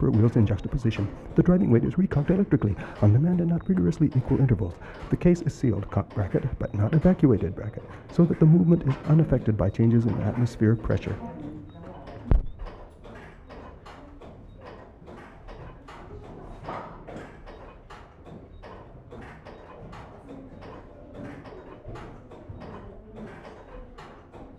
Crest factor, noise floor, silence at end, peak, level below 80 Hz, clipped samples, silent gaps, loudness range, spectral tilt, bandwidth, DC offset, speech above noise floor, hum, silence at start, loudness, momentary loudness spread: 18 dB; -46 dBFS; 0.1 s; -6 dBFS; -40 dBFS; under 0.1%; none; 22 LU; -9.5 dB/octave; 8 kHz; under 0.1%; 24 dB; none; 0 s; -24 LUFS; 24 LU